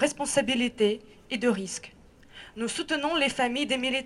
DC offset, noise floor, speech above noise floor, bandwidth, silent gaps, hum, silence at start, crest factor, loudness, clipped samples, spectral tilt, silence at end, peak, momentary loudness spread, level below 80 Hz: under 0.1%; -50 dBFS; 22 dB; 12.5 kHz; none; none; 0 s; 18 dB; -27 LUFS; under 0.1%; -3 dB/octave; 0 s; -10 dBFS; 12 LU; -58 dBFS